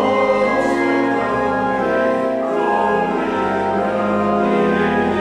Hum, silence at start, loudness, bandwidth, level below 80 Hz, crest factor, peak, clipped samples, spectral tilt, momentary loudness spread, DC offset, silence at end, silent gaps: none; 0 s; -17 LUFS; 11.5 kHz; -46 dBFS; 12 dB; -4 dBFS; under 0.1%; -6.5 dB/octave; 3 LU; under 0.1%; 0 s; none